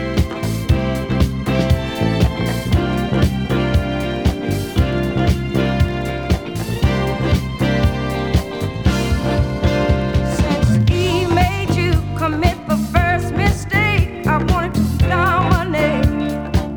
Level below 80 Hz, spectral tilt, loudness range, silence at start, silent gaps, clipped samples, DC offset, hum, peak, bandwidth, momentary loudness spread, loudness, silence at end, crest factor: -26 dBFS; -6.5 dB/octave; 2 LU; 0 s; none; under 0.1%; under 0.1%; none; 0 dBFS; over 20 kHz; 5 LU; -18 LUFS; 0 s; 16 dB